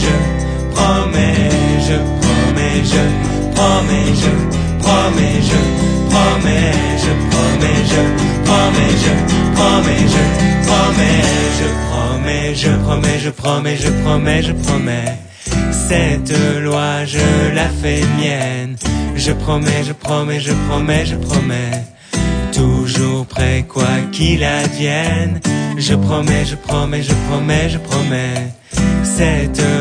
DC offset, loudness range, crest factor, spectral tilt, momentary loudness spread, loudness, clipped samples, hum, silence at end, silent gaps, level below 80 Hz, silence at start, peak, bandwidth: under 0.1%; 4 LU; 14 dB; -5 dB/octave; 6 LU; -14 LUFS; under 0.1%; none; 0 s; none; -24 dBFS; 0 s; 0 dBFS; 10 kHz